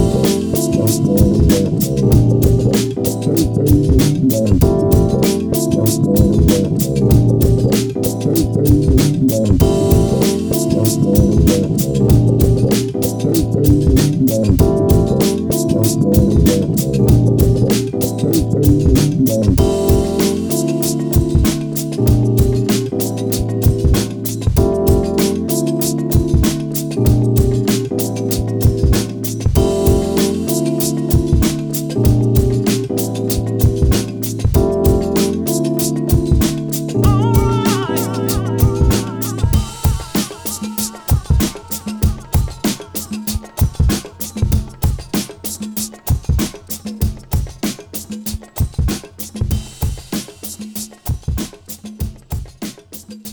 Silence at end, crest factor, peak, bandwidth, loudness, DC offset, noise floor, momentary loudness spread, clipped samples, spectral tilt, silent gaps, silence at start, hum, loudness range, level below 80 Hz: 0 s; 14 dB; 0 dBFS; over 20 kHz; -15 LUFS; under 0.1%; -35 dBFS; 10 LU; under 0.1%; -6.5 dB/octave; none; 0 s; none; 8 LU; -22 dBFS